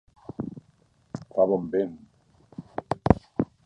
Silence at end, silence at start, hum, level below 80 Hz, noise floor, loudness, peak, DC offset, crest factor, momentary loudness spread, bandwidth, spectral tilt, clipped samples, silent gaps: 0.2 s; 0.4 s; none; -44 dBFS; -63 dBFS; -27 LUFS; 0 dBFS; under 0.1%; 28 dB; 20 LU; 10 kHz; -9.5 dB/octave; under 0.1%; none